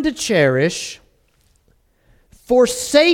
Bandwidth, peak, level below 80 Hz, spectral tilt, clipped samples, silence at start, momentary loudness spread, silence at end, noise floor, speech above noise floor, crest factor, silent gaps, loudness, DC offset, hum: 17 kHz; 0 dBFS; -50 dBFS; -4 dB/octave; under 0.1%; 0 s; 14 LU; 0 s; -59 dBFS; 43 dB; 18 dB; none; -16 LUFS; under 0.1%; none